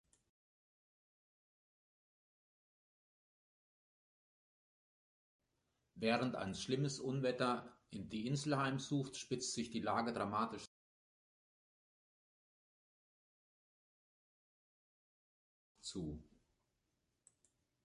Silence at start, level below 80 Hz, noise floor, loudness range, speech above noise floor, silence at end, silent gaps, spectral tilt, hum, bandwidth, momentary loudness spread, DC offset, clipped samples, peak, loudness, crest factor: 5.95 s; -72 dBFS; -86 dBFS; 15 LU; 46 dB; 1.6 s; 10.67-15.75 s; -5 dB/octave; none; 11 kHz; 13 LU; under 0.1%; under 0.1%; -22 dBFS; -41 LUFS; 24 dB